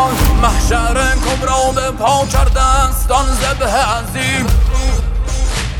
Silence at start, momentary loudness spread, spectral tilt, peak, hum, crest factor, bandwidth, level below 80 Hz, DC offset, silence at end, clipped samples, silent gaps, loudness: 0 s; 5 LU; -4 dB/octave; 0 dBFS; none; 12 dB; 19 kHz; -16 dBFS; under 0.1%; 0 s; under 0.1%; none; -14 LUFS